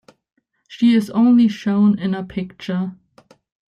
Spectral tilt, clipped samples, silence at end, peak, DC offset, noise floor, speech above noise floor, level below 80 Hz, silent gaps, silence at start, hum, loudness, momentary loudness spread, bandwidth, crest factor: -7.5 dB/octave; under 0.1%; 0.8 s; -6 dBFS; under 0.1%; -53 dBFS; 36 dB; -58 dBFS; none; 0.7 s; none; -18 LUFS; 13 LU; 10 kHz; 12 dB